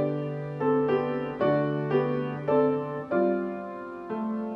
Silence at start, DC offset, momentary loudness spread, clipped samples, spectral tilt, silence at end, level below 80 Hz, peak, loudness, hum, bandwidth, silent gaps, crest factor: 0 s; under 0.1%; 9 LU; under 0.1%; -9.5 dB/octave; 0 s; -64 dBFS; -12 dBFS; -28 LUFS; none; 5.8 kHz; none; 16 dB